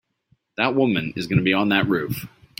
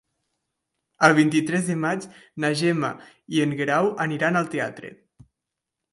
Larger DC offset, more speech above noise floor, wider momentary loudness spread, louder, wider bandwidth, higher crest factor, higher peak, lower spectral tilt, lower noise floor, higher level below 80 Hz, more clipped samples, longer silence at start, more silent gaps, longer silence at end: neither; second, 44 dB vs 62 dB; about the same, 11 LU vs 13 LU; about the same, -21 LUFS vs -23 LUFS; first, 16.5 kHz vs 11.5 kHz; about the same, 20 dB vs 24 dB; about the same, -2 dBFS vs 0 dBFS; about the same, -6.5 dB/octave vs -5.5 dB/octave; second, -65 dBFS vs -85 dBFS; first, -54 dBFS vs -68 dBFS; neither; second, 0.6 s vs 1 s; neither; second, 0.3 s vs 1.05 s